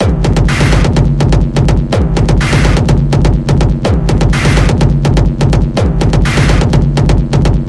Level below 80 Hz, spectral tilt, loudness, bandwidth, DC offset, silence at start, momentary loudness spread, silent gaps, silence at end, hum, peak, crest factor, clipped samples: -14 dBFS; -6.5 dB/octave; -11 LUFS; 12 kHz; under 0.1%; 0 s; 2 LU; none; 0 s; none; 0 dBFS; 8 dB; under 0.1%